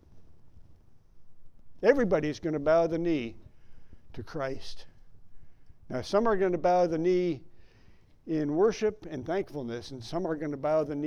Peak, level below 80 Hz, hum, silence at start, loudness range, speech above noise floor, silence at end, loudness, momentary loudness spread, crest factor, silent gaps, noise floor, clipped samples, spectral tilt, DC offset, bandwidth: -8 dBFS; -54 dBFS; none; 0.1 s; 5 LU; 28 dB; 0 s; -29 LUFS; 15 LU; 22 dB; none; -56 dBFS; under 0.1%; -6.5 dB/octave; under 0.1%; 10.5 kHz